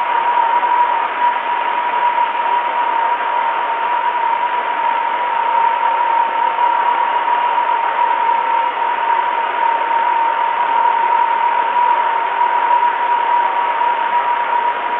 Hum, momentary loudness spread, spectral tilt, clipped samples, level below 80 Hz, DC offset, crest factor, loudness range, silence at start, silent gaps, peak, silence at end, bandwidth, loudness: none; 3 LU; -4 dB/octave; under 0.1%; -70 dBFS; under 0.1%; 12 dB; 2 LU; 0 s; none; -4 dBFS; 0 s; 4 kHz; -15 LUFS